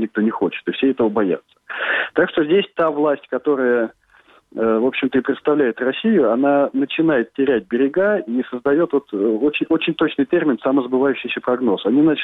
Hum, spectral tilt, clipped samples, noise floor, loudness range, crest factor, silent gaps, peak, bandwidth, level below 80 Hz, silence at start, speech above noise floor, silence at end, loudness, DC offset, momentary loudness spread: none; -8.5 dB/octave; under 0.1%; -52 dBFS; 2 LU; 16 dB; none; -2 dBFS; 4.1 kHz; -60 dBFS; 0 s; 35 dB; 0 s; -18 LUFS; under 0.1%; 5 LU